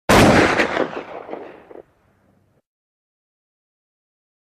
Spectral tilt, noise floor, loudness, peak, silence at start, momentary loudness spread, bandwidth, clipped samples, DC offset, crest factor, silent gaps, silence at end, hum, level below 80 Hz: -5 dB/octave; -60 dBFS; -15 LUFS; -2 dBFS; 0.1 s; 23 LU; 15 kHz; under 0.1%; under 0.1%; 20 dB; none; 2.6 s; none; -38 dBFS